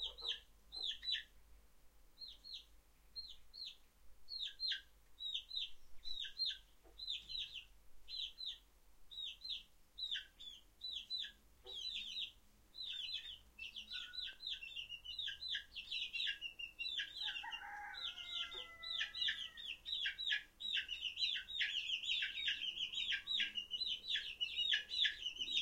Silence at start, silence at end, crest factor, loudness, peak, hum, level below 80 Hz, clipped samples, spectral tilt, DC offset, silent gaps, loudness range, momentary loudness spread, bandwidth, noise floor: 0 s; 0 s; 24 dB; -42 LUFS; -22 dBFS; none; -70 dBFS; under 0.1%; 1 dB/octave; under 0.1%; none; 8 LU; 13 LU; 16 kHz; -66 dBFS